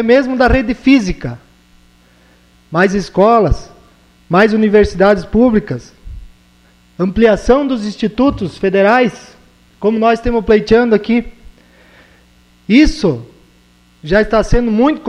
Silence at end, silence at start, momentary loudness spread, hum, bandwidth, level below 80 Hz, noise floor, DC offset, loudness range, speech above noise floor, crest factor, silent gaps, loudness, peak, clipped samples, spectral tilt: 0 s; 0 s; 11 LU; 60 Hz at -45 dBFS; 10.5 kHz; -28 dBFS; -49 dBFS; under 0.1%; 3 LU; 37 dB; 14 dB; none; -12 LUFS; 0 dBFS; under 0.1%; -6.5 dB/octave